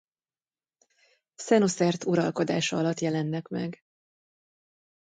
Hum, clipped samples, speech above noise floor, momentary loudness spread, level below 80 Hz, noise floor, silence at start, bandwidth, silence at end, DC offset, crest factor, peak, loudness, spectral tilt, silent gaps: none; under 0.1%; over 64 dB; 11 LU; -72 dBFS; under -90 dBFS; 1.4 s; 9.4 kHz; 1.4 s; under 0.1%; 20 dB; -10 dBFS; -27 LUFS; -5.5 dB/octave; none